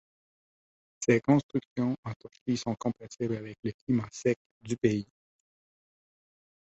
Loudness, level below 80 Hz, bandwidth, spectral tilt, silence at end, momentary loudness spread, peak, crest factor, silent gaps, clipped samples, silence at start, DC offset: -31 LUFS; -64 dBFS; 8.2 kHz; -6.5 dB/octave; 1.65 s; 12 LU; -10 dBFS; 22 dB; 1.43-1.49 s, 1.67-1.76 s, 1.98-2.03 s, 2.16-2.20 s, 2.41-2.46 s, 3.59-3.63 s, 3.74-3.87 s, 4.36-4.61 s; under 0.1%; 1 s; under 0.1%